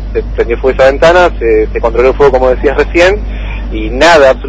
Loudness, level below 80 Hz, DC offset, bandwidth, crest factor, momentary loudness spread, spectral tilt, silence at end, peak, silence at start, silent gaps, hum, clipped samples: -8 LUFS; -18 dBFS; under 0.1%; 11 kHz; 8 dB; 12 LU; -5.5 dB/octave; 0 s; 0 dBFS; 0 s; none; none; 2%